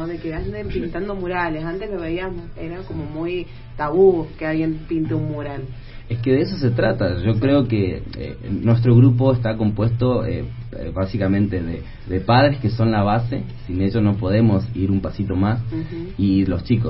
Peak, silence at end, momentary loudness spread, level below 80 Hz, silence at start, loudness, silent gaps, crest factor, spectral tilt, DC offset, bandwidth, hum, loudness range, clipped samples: -2 dBFS; 0 s; 14 LU; -36 dBFS; 0 s; -20 LUFS; none; 18 dB; -12.5 dB/octave; under 0.1%; 5.8 kHz; none; 4 LU; under 0.1%